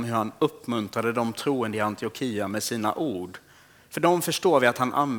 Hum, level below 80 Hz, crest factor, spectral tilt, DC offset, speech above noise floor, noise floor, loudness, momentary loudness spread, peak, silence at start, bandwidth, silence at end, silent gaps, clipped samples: none; -70 dBFS; 20 dB; -4.5 dB/octave; under 0.1%; 29 dB; -54 dBFS; -26 LUFS; 9 LU; -6 dBFS; 0 s; over 20 kHz; 0 s; none; under 0.1%